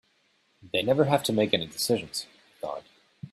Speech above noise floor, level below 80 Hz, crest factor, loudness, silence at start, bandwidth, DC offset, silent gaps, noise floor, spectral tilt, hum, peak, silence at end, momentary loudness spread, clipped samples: 42 dB; -66 dBFS; 22 dB; -27 LUFS; 0.65 s; 15.5 kHz; under 0.1%; none; -68 dBFS; -4.5 dB/octave; none; -6 dBFS; 0.05 s; 17 LU; under 0.1%